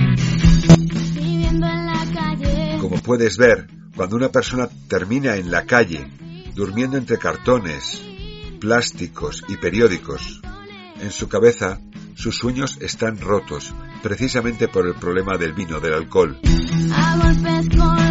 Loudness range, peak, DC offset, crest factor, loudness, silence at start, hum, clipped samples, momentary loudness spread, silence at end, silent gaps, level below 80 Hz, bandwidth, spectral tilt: 5 LU; 0 dBFS; under 0.1%; 18 dB; -19 LUFS; 0 s; none; under 0.1%; 15 LU; 0 s; none; -28 dBFS; 8 kHz; -5.5 dB/octave